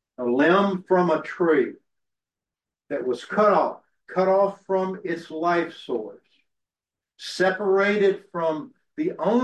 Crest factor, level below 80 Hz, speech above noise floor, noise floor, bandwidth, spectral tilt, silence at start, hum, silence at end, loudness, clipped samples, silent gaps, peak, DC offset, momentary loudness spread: 16 dB; -72 dBFS; over 68 dB; under -90 dBFS; 10 kHz; -6.5 dB/octave; 0.2 s; none; 0 s; -23 LUFS; under 0.1%; none; -8 dBFS; under 0.1%; 12 LU